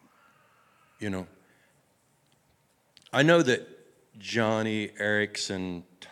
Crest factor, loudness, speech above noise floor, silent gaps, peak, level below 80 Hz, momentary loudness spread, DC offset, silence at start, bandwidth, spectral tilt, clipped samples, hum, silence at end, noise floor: 24 dB; -27 LUFS; 41 dB; none; -8 dBFS; -74 dBFS; 19 LU; under 0.1%; 1 s; 14 kHz; -4.5 dB/octave; under 0.1%; none; 0.05 s; -68 dBFS